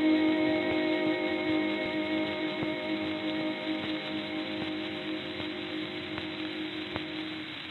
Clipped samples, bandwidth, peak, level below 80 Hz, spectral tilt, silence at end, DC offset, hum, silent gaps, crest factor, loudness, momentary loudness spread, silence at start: under 0.1%; 5.8 kHz; -12 dBFS; -66 dBFS; -6.5 dB/octave; 0 s; under 0.1%; none; none; 20 dB; -32 LUFS; 8 LU; 0 s